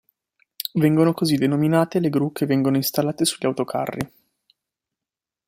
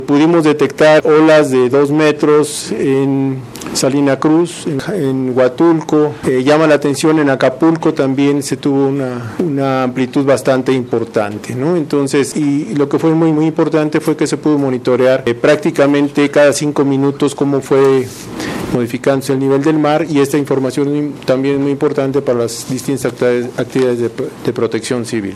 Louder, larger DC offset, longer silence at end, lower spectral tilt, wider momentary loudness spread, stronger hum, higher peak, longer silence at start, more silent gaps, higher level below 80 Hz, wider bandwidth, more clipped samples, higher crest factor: second, -21 LUFS vs -13 LUFS; neither; first, 1.4 s vs 0 s; about the same, -5.5 dB/octave vs -6 dB/octave; about the same, 9 LU vs 8 LU; neither; second, -4 dBFS vs 0 dBFS; first, 0.6 s vs 0 s; neither; second, -60 dBFS vs -52 dBFS; first, 16 kHz vs 14 kHz; neither; first, 18 dB vs 12 dB